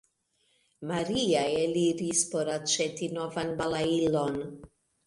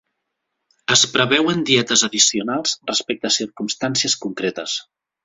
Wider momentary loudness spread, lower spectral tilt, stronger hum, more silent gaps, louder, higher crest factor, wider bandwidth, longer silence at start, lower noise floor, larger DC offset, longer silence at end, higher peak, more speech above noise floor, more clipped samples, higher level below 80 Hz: second, 8 LU vs 11 LU; first, -4 dB/octave vs -2 dB/octave; neither; neither; second, -29 LUFS vs -18 LUFS; about the same, 18 dB vs 20 dB; first, 11.5 kHz vs 8.2 kHz; about the same, 0.8 s vs 0.9 s; second, -72 dBFS vs -77 dBFS; neither; about the same, 0.4 s vs 0.4 s; second, -12 dBFS vs 0 dBFS; second, 44 dB vs 58 dB; neither; about the same, -60 dBFS vs -60 dBFS